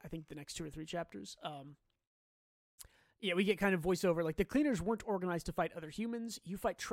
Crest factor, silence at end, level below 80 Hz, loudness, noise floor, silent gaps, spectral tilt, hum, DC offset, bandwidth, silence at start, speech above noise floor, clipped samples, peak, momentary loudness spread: 18 dB; 0 s; -58 dBFS; -37 LUFS; under -90 dBFS; 2.07-2.78 s; -5.5 dB/octave; none; under 0.1%; 16.5 kHz; 0.05 s; over 53 dB; under 0.1%; -20 dBFS; 14 LU